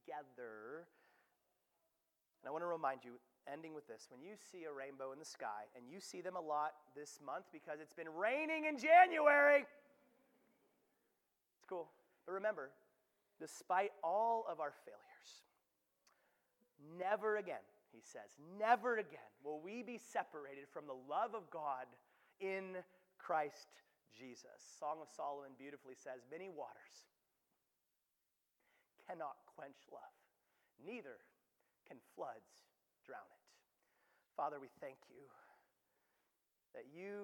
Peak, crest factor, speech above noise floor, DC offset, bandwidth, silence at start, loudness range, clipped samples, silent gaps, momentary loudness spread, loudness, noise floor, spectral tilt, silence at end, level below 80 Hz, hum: -18 dBFS; 28 dB; 46 dB; under 0.1%; 18 kHz; 0.1 s; 22 LU; under 0.1%; none; 22 LU; -41 LUFS; -88 dBFS; -4 dB/octave; 0 s; under -90 dBFS; none